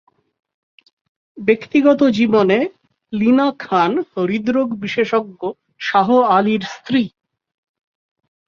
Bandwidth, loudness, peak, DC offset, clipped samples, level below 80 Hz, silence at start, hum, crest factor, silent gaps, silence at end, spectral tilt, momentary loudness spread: 7.2 kHz; -17 LUFS; -2 dBFS; under 0.1%; under 0.1%; -60 dBFS; 1.35 s; none; 16 dB; none; 1.4 s; -6.5 dB/octave; 12 LU